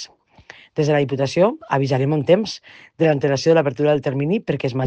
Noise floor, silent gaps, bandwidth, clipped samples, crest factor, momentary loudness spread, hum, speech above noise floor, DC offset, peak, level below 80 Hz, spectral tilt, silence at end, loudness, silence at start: -47 dBFS; none; 8.6 kHz; under 0.1%; 18 dB; 6 LU; none; 28 dB; under 0.1%; -2 dBFS; -60 dBFS; -6.5 dB/octave; 0 s; -19 LUFS; 0 s